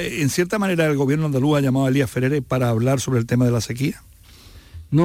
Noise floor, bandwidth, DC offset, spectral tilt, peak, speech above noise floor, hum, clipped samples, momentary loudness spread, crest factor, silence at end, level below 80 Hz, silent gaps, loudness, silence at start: -45 dBFS; 16.5 kHz; under 0.1%; -6.5 dB/octave; -6 dBFS; 25 dB; none; under 0.1%; 4 LU; 12 dB; 0 s; -48 dBFS; none; -20 LUFS; 0 s